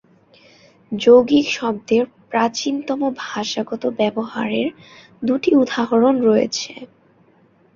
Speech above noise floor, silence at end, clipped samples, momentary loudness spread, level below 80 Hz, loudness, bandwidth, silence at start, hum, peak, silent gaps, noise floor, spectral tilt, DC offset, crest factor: 37 dB; 0.9 s; under 0.1%; 12 LU; -60 dBFS; -18 LUFS; 7.4 kHz; 0.9 s; none; -2 dBFS; none; -55 dBFS; -4.5 dB/octave; under 0.1%; 18 dB